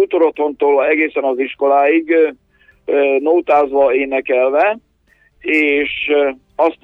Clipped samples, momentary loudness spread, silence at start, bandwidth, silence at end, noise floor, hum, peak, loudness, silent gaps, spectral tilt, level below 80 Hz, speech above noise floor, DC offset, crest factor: under 0.1%; 5 LU; 0 s; 5.2 kHz; 0.1 s; -56 dBFS; none; -2 dBFS; -15 LUFS; none; -5.5 dB/octave; -54 dBFS; 42 dB; under 0.1%; 12 dB